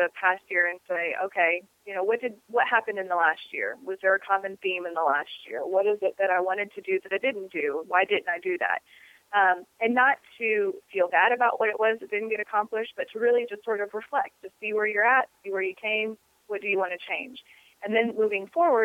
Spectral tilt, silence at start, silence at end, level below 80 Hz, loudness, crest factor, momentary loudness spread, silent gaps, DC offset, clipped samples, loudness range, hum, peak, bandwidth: -5 dB/octave; 0 s; 0 s; -80 dBFS; -26 LUFS; 20 dB; 9 LU; none; under 0.1%; under 0.1%; 3 LU; none; -8 dBFS; 15 kHz